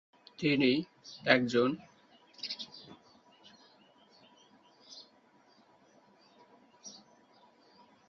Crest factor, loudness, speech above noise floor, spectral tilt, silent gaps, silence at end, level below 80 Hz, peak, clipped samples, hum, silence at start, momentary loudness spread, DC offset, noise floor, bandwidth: 30 dB; -31 LUFS; 35 dB; -5 dB/octave; none; 1.15 s; -76 dBFS; -8 dBFS; under 0.1%; none; 0.4 s; 25 LU; under 0.1%; -65 dBFS; 7.4 kHz